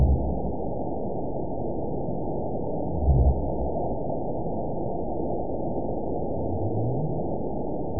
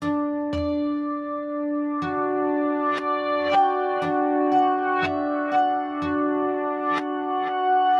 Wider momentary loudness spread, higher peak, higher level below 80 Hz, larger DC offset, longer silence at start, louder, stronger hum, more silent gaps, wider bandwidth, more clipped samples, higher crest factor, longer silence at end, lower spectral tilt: about the same, 7 LU vs 6 LU; about the same, -10 dBFS vs -10 dBFS; first, -32 dBFS vs -54 dBFS; first, 3% vs under 0.1%; about the same, 0 s vs 0 s; second, -29 LUFS vs -24 LUFS; neither; neither; second, 1 kHz vs 7 kHz; neither; about the same, 18 dB vs 14 dB; about the same, 0 s vs 0 s; first, -18.5 dB/octave vs -6.5 dB/octave